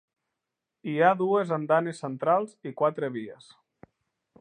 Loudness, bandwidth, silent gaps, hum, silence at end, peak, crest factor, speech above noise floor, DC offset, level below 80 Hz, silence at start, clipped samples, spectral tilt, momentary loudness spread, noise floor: -26 LUFS; 10 kHz; none; none; 1.05 s; -6 dBFS; 22 dB; 60 dB; under 0.1%; -80 dBFS; 0.85 s; under 0.1%; -7 dB/octave; 15 LU; -86 dBFS